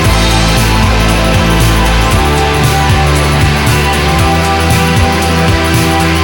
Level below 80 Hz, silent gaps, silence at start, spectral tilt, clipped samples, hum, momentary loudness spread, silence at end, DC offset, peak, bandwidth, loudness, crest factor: -16 dBFS; none; 0 s; -4.5 dB/octave; under 0.1%; none; 1 LU; 0 s; under 0.1%; 0 dBFS; 19.5 kHz; -9 LUFS; 8 dB